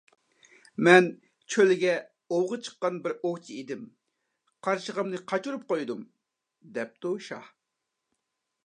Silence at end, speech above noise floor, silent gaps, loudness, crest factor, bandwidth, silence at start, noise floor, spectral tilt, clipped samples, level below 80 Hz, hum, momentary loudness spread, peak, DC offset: 1.2 s; 57 dB; none; -27 LUFS; 26 dB; 10 kHz; 0.8 s; -84 dBFS; -5 dB/octave; under 0.1%; -84 dBFS; none; 19 LU; -2 dBFS; under 0.1%